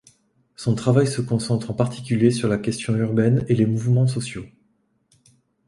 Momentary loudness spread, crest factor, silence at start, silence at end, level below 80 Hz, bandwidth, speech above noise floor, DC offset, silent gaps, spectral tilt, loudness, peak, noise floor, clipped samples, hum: 6 LU; 18 dB; 0.6 s; 1.2 s; -54 dBFS; 11.5 kHz; 46 dB; under 0.1%; none; -7 dB/octave; -21 LUFS; -4 dBFS; -66 dBFS; under 0.1%; none